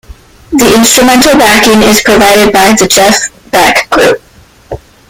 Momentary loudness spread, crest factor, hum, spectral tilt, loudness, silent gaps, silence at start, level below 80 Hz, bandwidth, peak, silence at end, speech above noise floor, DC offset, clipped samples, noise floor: 10 LU; 6 dB; none; -2.5 dB/octave; -5 LUFS; none; 0.1 s; -32 dBFS; over 20 kHz; 0 dBFS; 0.35 s; 25 dB; under 0.1%; 2%; -30 dBFS